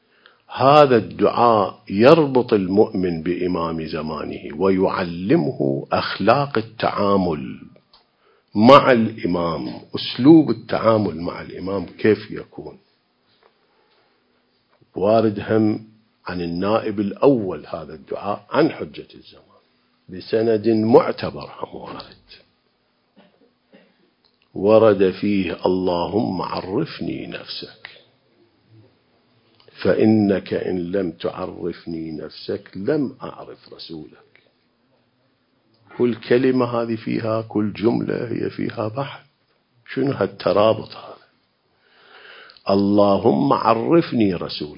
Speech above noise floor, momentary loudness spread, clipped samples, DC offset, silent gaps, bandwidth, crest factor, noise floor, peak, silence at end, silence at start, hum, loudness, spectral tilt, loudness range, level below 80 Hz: 46 dB; 19 LU; under 0.1%; under 0.1%; none; 7.2 kHz; 20 dB; -65 dBFS; 0 dBFS; 0.05 s; 0.5 s; none; -19 LUFS; -8.5 dB/octave; 11 LU; -52 dBFS